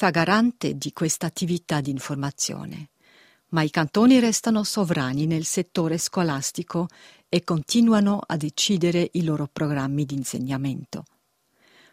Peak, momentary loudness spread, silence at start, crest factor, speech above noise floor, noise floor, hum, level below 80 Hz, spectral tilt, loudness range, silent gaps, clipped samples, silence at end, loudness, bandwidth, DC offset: -4 dBFS; 10 LU; 0 s; 20 dB; 44 dB; -67 dBFS; none; -60 dBFS; -4.5 dB/octave; 4 LU; none; under 0.1%; 0.9 s; -23 LUFS; 16 kHz; under 0.1%